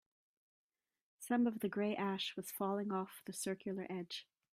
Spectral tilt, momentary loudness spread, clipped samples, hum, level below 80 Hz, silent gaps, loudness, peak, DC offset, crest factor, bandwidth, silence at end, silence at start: -4.5 dB/octave; 10 LU; under 0.1%; none; -84 dBFS; none; -40 LUFS; -22 dBFS; under 0.1%; 18 dB; 15.5 kHz; 0.3 s; 1.2 s